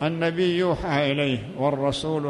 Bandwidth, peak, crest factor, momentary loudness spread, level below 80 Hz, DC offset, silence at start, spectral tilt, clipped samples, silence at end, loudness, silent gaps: 11.5 kHz; -10 dBFS; 14 dB; 3 LU; -48 dBFS; under 0.1%; 0 s; -6.5 dB/octave; under 0.1%; 0 s; -24 LUFS; none